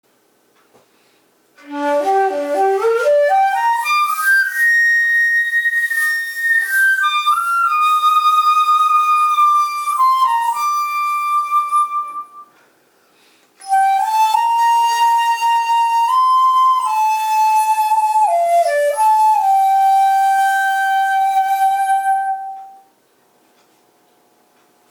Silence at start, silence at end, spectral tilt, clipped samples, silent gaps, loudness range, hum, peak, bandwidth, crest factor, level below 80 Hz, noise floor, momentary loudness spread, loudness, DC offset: 1.65 s; 2.2 s; 0.5 dB/octave; under 0.1%; none; 6 LU; none; -4 dBFS; over 20 kHz; 12 dB; -74 dBFS; -57 dBFS; 5 LU; -14 LUFS; under 0.1%